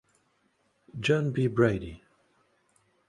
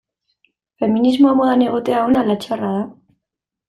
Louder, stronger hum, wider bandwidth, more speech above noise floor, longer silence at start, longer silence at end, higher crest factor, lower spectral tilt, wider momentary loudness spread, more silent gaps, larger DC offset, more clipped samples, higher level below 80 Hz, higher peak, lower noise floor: second, -27 LUFS vs -16 LUFS; neither; about the same, 11.5 kHz vs 12 kHz; second, 45 dB vs 67 dB; first, 0.95 s vs 0.8 s; first, 1.1 s vs 0.75 s; first, 22 dB vs 16 dB; about the same, -7 dB/octave vs -7 dB/octave; first, 18 LU vs 10 LU; neither; neither; neither; about the same, -56 dBFS vs -56 dBFS; second, -8 dBFS vs -2 dBFS; second, -71 dBFS vs -82 dBFS